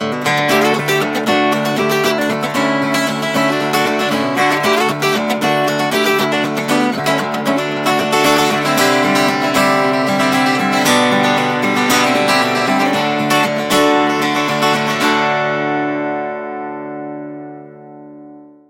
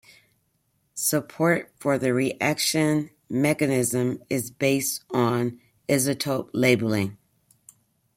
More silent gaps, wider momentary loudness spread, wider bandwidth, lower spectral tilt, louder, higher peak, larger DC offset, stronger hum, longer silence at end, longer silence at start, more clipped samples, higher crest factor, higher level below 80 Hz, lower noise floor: neither; about the same, 6 LU vs 7 LU; about the same, 16.5 kHz vs 16.5 kHz; about the same, -4 dB/octave vs -4.5 dB/octave; first, -14 LUFS vs -24 LUFS; first, -2 dBFS vs -6 dBFS; neither; neither; second, 0.25 s vs 1 s; second, 0 s vs 0.95 s; neither; second, 14 dB vs 20 dB; first, -58 dBFS vs -64 dBFS; second, -38 dBFS vs -71 dBFS